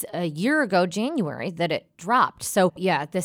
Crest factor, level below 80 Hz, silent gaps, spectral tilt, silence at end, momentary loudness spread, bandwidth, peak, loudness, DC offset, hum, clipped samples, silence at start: 16 dB; -66 dBFS; none; -5 dB/octave; 0 s; 7 LU; 18.5 kHz; -8 dBFS; -24 LUFS; under 0.1%; none; under 0.1%; 0 s